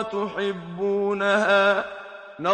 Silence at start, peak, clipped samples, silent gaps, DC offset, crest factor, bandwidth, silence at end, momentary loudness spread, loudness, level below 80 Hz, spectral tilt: 0 s; -6 dBFS; under 0.1%; none; under 0.1%; 18 dB; 9.2 kHz; 0 s; 16 LU; -23 LUFS; -64 dBFS; -5 dB/octave